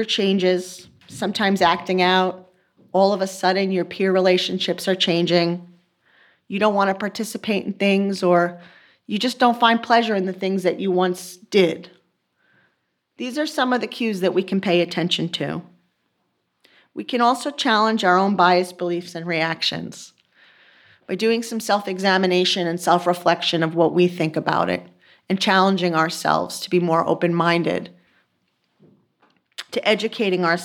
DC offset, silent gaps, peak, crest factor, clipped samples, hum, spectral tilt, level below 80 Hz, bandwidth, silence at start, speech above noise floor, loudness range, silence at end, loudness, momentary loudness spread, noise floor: under 0.1%; none; -2 dBFS; 18 dB; under 0.1%; none; -5 dB/octave; -70 dBFS; 18 kHz; 0 s; 51 dB; 4 LU; 0 s; -20 LUFS; 11 LU; -71 dBFS